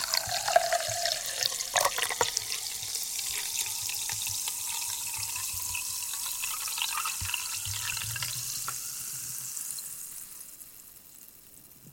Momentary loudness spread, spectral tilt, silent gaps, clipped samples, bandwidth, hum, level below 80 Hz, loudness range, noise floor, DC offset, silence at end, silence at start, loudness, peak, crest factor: 17 LU; 0.5 dB/octave; none; under 0.1%; 17 kHz; none; -60 dBFS; 6 LU; -53 dBFS; under 0.1%; 0 s; 0 s; -30 LUFS; -6 dBFS; 28 dB